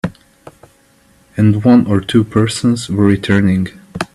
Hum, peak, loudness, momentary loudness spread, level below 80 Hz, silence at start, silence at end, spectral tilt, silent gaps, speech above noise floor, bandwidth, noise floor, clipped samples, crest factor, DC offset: none; 0 dBFS; -13 LUFS; 14 LU; -46 dBFS; 0.05 s; 0.1 s; -6.5 dB/octave; none; 39 dB; 12.5 kHz; -51 dBFS; under 0.1%; 14 dB; under 0.1%